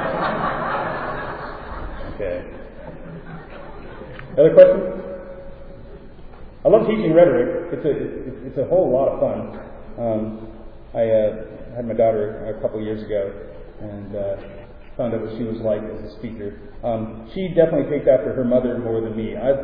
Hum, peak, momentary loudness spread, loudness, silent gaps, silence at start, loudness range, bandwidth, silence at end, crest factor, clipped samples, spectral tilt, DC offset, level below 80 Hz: none; 0 dBFS; 21 LU; -20 LUFS; none; 0 s; 10 LU; 4.8 kHz; 0 s; 20 dB; under 0.1%; -11 dB/octave; under 0.1%; -40 dBFS